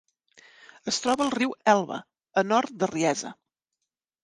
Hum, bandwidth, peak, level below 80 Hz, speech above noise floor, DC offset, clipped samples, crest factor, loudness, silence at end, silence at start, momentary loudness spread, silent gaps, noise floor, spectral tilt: none; 11.5 kHz; -6 dBFS; -70 dBFS; 60 dB; under 0.1%; under 0.1%; 22 dB; -26 LUFS; 0.9 s; 0.85 s; 13 LU; none; -85 dBFS; -3.5 dB/octave